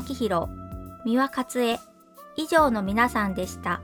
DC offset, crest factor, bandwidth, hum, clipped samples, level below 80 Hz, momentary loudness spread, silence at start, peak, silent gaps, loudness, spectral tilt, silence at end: under 0.1%; 20 dB; 19.5 kHz; none; under 0.1%; -46 dBFS; 14 LU; 0 s; -6 dBFS; none; -25 LUFS; -5 dB/octave; 0 s